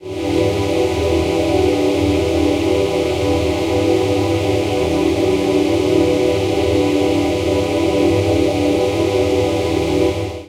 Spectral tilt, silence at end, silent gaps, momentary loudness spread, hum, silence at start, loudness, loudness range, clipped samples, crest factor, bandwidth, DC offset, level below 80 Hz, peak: -6 dB/octave; 0 s; none; 2 LU; none; 0 s; -16 LUFS; 1 LU; under 0.1%; 12 dB; 16 kHz; under 0.1%; -34 dBFS; -2 dBFS